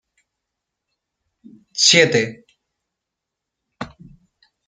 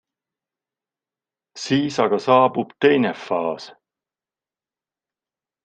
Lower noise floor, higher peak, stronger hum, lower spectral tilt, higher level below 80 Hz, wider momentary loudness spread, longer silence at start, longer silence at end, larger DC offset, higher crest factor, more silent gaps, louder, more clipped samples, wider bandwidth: second, -82 dBFS vs under -90 dBFS; about the same, 0 dBFS vs -2 dBFS; neither; second, -2 dB/octave vs -5.5 dB/octave; first, -62 dBFS vs -68 dBFS; first, 24 LU vs 11 LU; first, 1.75 s vs 1.55 s; second, 0.8 s vs 1.95 s; neither; about the same, 24 dB vs 20 dB; neither; first, -14 LUFS vs -19 LUFS; neither; first, 10 kHz vs 9 kHz